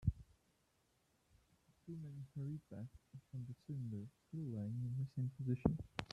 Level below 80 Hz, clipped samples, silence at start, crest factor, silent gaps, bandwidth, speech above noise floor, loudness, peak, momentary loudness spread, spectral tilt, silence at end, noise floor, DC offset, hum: -58 dBFS; under 0.1%; 0 s; 28 dB; none; 9.6 kHz; 35 dB; -46 LUFS; -18 dBFS; 14 LU; -8.5 dB/octave; 0 s; -79 dBFS; under 0.1%; none